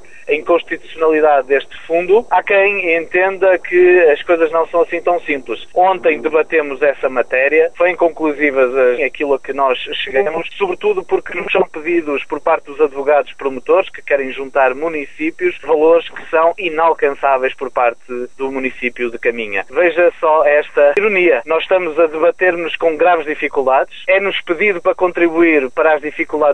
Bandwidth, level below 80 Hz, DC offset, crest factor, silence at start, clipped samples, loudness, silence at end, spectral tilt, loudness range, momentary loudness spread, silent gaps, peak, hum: 8.6 kHz; -50 dBFS; 2%; 14 dB; 0.25 s; under 0.1%; -14 LUFS; 0 s; -5.5 dB/octave; 4 LU; 8 LU; none; 0 dBFS; none